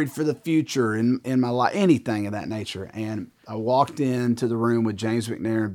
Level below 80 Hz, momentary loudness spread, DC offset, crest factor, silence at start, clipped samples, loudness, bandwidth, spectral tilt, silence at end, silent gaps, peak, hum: -64 dBFS; 10 LU; under 0.1%; 18 dB; 0 s; under 0.1%; -24 LUFS; 18 kHz; -6.5 dB/octave; 0 s; none; -6 dBFS; none